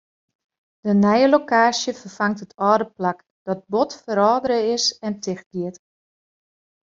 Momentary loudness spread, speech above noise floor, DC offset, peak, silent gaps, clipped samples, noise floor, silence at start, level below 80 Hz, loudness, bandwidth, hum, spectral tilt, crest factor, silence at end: 13 LU; over 70 dB; under 0.1%; -2 dBFS; 3.31-3.46 s, 5.46-5.51 s; under 0.1%; under -90 dBFS; 0.85 s; -64 dBFS; -20 LUFS; 7.6 kHz; none; -4.5 dB/octave; 18 dB; 1.1 s